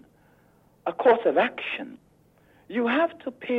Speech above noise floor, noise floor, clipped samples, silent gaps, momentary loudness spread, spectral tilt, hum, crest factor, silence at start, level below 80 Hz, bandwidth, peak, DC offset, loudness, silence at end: 36 dB; -60 dBFS; under 0.1%; none; 14 LU; -6.5 dB/octave; none; 18 dB; 0.85 s; -70 dBFS; 5.2 kHz; -8 dBFS; under 0.1%; -25 LUFS; 0 s